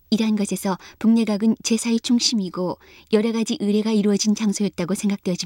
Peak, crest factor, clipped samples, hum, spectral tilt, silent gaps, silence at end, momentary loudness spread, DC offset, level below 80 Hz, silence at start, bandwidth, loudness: -6 dBFS; 16 dB; under 0.1%; none; -4.5 dB/octave; none; 0 s; 7 LU; under 0.1%; -60 dBFS; 0.1 s; 16.5 kHz; -21 LUFS